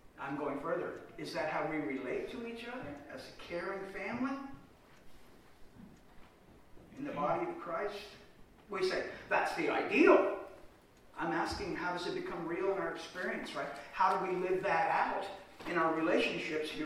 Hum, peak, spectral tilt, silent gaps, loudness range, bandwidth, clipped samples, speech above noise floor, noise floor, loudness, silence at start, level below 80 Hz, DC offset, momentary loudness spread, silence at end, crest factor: none; -14 dBFS; -5 dB/octave; none; 11 LU; 15 kHz; under 0.1%; 26 dB; -60 dBFS; -35 LUFS; 0.05 s; -64 dBFS; under 0.1%; 14 LU; 0 s; 24 dB